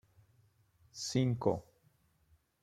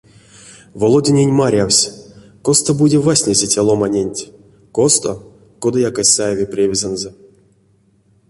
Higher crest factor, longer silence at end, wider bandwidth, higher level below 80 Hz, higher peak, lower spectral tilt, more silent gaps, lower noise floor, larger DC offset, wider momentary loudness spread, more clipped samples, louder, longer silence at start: first, 24 dB vs 16 dB; second, 1 s vs 1.2 s; first, 13.5 kHz vs 11.5 kHz; second, -68 dBFS vs -48 dBFS; second, -16 dBFS vs 0 dBFS; first, -6 dB/octave vs -4 dB/octave; neither; first, -72 dBFS vs -55 dBFS; neither; about the same, 12 LU vs 12 LU; neither; second, -35 LUFS vs -14 LUFS; first, 0.95 s vs 0.45 s